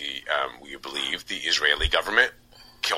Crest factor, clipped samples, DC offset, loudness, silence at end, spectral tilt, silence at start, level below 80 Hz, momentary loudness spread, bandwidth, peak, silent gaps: 24 dB; under 0.1%; under 0.1%; -24 LUFS; 0 s; -1.5 dB/octave; 0 s; -40 dBFS; 11 LU; 16.5 kHz; -2 dBFS; none